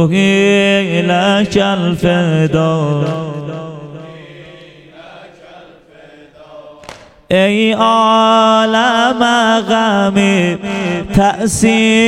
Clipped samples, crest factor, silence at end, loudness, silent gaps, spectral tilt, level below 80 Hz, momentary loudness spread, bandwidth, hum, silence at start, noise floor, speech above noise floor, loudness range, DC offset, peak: under 0.1%; 14 dB; 0 s; -12 LUFS; none; -5 dB/octave; -40 dBFS; 12 LU; 13.5 kHz; none; 0 s; -40 dBFS; 29 dB; 13 LU; under 0.1%; 0 dBFS